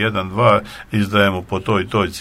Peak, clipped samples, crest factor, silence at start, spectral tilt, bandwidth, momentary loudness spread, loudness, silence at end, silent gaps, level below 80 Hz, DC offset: 0 dBFS; under 0.1%; 18 dB; 0 s; -6 dB/octave; 15.5 kHz; 7 LU; -17 LUFS; 0 s; none; -46 dBFS; under 0.1%